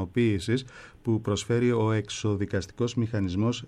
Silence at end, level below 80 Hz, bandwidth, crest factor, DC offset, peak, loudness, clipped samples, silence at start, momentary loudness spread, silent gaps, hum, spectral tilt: 0 s; -54 dBFS; 11 kHz; 12 dB; under 0.1%; -14 dBFS; -28 LUFS; under 0.1%; 0 s; 6 LU; none; none; -6 dB/octave